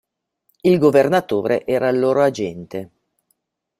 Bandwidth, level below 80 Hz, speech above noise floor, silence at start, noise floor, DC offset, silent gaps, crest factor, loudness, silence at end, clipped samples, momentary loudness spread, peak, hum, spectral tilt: 15 kHz; -60 dBFS; 53 dB; 0.65 s; -70 dBFS; under 0.1%; none; 18 dB; -17 LUFS; 0.95 s; under 0.1%; 15 LU; -2 dBFS; none; -7 dB/octave